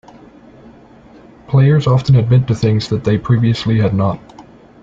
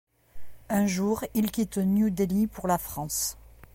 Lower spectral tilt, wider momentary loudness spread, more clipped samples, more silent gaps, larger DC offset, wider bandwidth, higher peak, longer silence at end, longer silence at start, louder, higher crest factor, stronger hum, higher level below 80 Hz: first, -8 dB/octave vs -5.5 dB/octave; about the same, 6 LU vs 5 LU; neither; neither; neither; second, 7.4 kHz vs 17 kHz; first, -2 dBFS vs -12 dBFS; first, 0.4 s vs 0.1 s; first, 1.5 s vs 0.35 s; first, -14 LUFS vs -27 LUFS; about the same, 12 dB vs 16 dB; neither; first, -42 dBFS vs -50 dBFS